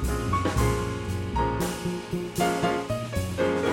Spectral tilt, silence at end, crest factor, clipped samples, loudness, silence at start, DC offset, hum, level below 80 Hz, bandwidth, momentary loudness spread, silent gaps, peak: -5.5 dB/octave; 0 s; 14 dB; under 0.1%; -27 LUFS; 0 s; under 0.1%; none; -36 dBFS; 17 kHz; 6 LU; none; -12 dBFS